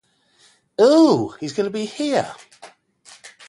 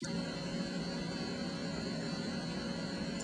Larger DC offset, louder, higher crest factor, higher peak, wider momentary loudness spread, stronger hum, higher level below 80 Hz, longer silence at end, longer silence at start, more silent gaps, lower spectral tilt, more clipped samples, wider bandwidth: neither; first, -18 LUFS vs -39 LUFS; first, 18 dB vs 12 dB; first, -4 dBFS vs -26 dBFS; first, 19 LU vs 1 LU; neither; second, -64 dBFS vs -58 dBFS; first, 0.2 s vs 0 s; first, 0.8 s vs 0 s; neither; about the same, -5.5 dB/octave vs -5 dB/octave; neither; about the same, 11.5 kHz vs 11 kHz